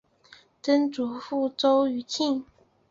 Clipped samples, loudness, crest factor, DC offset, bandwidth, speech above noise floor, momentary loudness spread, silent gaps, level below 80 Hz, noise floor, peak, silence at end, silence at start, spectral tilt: under 0.1%; -26 LUFS; 16 dB; under 0.1%; 7.6 kHz; 31 dB; 10 LU; none; -70 dBFS; -56 dBFS; -10 dBFS; 0.5 s; 0.65 s; -3.5 dB/octave